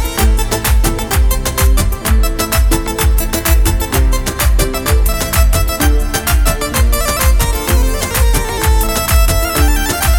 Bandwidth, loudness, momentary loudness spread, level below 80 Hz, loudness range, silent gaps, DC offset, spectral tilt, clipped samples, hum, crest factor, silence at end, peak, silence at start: over 20 kHz; -14 LUFS; 2 LU; -14 dBFS; 1 LU; none; under 0.1%; -4 dB/octave; under 0.1%; none; 12 dB; 0 s; 0 dBFS; 0 s